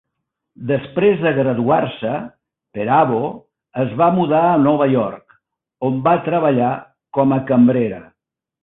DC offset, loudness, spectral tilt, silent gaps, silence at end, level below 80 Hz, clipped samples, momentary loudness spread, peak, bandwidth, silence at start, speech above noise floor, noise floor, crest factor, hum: under 0.1%; -17 LUFS; -12.5 dB/octave; none; 0.6 s; -56 dBFS; under 0.1%; 13 LU; -2 dBFS; 4 kHz; 0.6 s; 61 dB; -77 dBFS; 16 dB; none